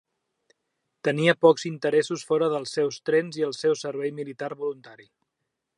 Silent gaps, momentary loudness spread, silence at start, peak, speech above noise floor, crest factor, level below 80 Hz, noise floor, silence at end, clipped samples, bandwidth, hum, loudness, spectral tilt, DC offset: none; 13 LU; 1.05 s; -4 dBFS; 57 dB; 22 dB; -78 dBFS; -82 dBFS; 0.8 s; under 0.1%; 11 kHz; none; -25 LUFS; -5 dB/octave; under 0.1%